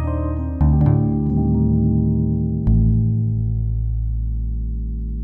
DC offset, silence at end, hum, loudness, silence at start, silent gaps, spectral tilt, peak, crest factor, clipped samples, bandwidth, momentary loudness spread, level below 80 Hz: under 0.1%; 0 s; none; -20 LUFS; 0 s; none; -13.5 dB/octave; -4 dBFS; 14 dB; under 0.1%; 2.6 kHz; 9 LU; -24 dBFS